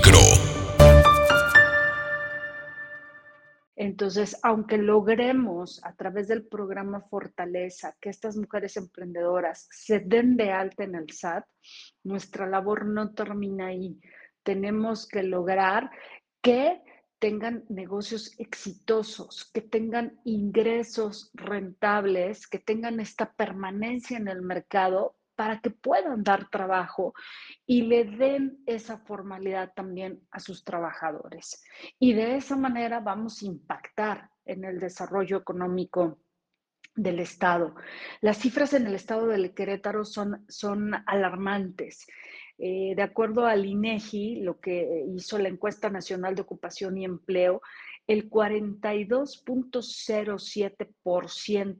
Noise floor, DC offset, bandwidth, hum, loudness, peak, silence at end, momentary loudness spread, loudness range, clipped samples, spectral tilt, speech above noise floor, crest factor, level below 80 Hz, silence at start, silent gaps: -83 dBFS; under 0.1%; 10 kHz; none; -26 LUFS; 0 dBFS; 0.05 s; 15 LU; 5 LU; under 0.1%; -4.5 dB/octave; 55 dB; 26 dB; -38 dBFS; 0 s; 3.67-3.72 s